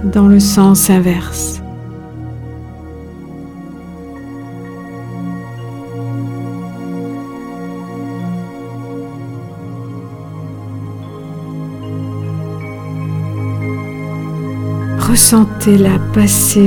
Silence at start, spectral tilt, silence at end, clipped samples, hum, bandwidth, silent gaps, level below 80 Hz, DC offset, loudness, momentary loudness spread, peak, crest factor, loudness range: 0 s; -5 dB/octave; 0 s; 0.2%; none; over 20 kHz; none; -36 dBFS; under 0.1%; -15 LUFS; 21 LU; 0 dBFS; 16 dB; 15 LU